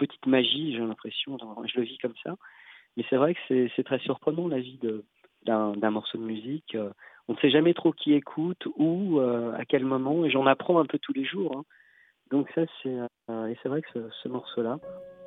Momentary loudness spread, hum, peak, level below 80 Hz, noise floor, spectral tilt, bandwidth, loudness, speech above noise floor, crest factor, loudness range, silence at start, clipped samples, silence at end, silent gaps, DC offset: 13 LU; none; -8 dBFS; -78 dBFS; -62 dBFS; -9 dB/octave; 4.1 kHz; -28 LUFS; 34 dB; 20 dB; 6 LU; 0 s; under 0.1%; 0 s; none; under 0.1%